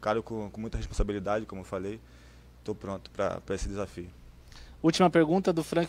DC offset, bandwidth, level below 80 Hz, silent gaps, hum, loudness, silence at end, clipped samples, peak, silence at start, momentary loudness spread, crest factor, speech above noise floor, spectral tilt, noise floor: under 0.1%; 14.5 kHz; -42 dBFS; none; none; -30 LUFS; 0 s; under 0.1%; -8 dBFS; 0 s; 16 LU; 22 dB; 20 dB; -6 dB/octave; -49 dBFS